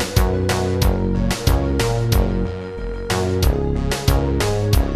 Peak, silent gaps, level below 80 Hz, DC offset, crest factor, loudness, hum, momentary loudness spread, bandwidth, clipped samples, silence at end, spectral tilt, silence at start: -2 dBFS; none; -22 dBFS; under 0.1%; 16 dB; -20 LUFS; none; 5 LU; 14 kHz; under 0.1%; 0 s; -5.5 dB/octave; 0 s